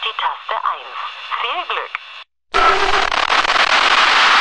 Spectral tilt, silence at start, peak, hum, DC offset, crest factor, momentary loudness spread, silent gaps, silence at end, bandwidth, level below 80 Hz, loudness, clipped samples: -0.5 dB/octave; 0 s; 0 dBFS; none; under 0.1%; 16 dB; 16 LU; none; 0 s; 11 kHz; -38 dBFS; -15 LUFS; under 0.1%